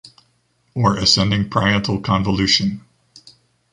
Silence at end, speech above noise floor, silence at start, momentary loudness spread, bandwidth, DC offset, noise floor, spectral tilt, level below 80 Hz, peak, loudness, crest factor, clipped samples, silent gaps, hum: 0.95 s; 46 dB; 0.05 s; 9 LU; 11 kHz; under 0.1%; -63 dBFS; -4.5 dB/octave; -42 dBFS; 0 dBFS; -17 LUFS; 20 dB; under 0.1%; none; none